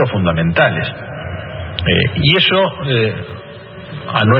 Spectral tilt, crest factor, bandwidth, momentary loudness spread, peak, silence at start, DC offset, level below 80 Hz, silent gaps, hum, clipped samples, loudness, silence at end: -9 dB/octave; 16 dB; 5.6 kHz; 19 LU; 0 dBFS; 0 s; under 0.1%; -38 dBFS; none; none; under 0.1%; -14 LUFS; 0 s